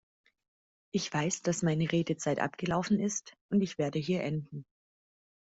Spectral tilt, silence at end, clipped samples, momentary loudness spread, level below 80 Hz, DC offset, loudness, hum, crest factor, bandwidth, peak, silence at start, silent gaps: -5 dB/octave; 0.8 s; under 0.1%; 7 LU; -66 dBFS; under 0.1%; -32 LUFS; none; 18 dB; 8 kHz; -16 dBFS; 0.95 s; 3.41-3.49 s